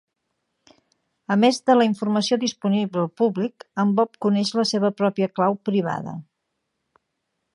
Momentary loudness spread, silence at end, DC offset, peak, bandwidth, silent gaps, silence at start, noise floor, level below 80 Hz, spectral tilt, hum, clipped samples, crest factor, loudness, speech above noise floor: 10 LU; 1.35 s; under 0.1%; -6 dBFS; 11.5 kHz; none; 1.3 s; -77 dBFS; -72 dBFS; -5.5 dB/octave; none; under 0.1%; 18 dB; -22 LUFS; 56 dB